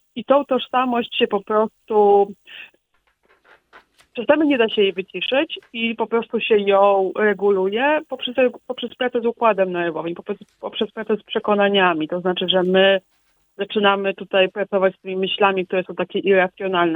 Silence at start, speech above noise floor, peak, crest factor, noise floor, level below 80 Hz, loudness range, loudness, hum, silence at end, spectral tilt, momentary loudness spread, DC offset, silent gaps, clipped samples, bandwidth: 0.15 s; 46 dB; 0 dBFS; 20 dB; -65 dBFS; -66 dBFS; 3 LU; -19 LUFS; none; 0 s; -7.5 dB/octave; 10 LU; under 0.1%; none; under 0.1%; 4 kHz